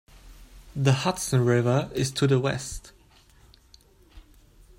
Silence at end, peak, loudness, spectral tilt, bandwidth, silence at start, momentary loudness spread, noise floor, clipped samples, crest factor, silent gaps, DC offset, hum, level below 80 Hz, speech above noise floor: 0.6 s; -8 dBFS; -25 LUFS; -5.5 dB/octave; 16 kHz; 0.25 s; 14 LU; -56 dBFS; under 0.1%; 20 dB; none; under 0.1%; none; -50 dBFS; 32 dB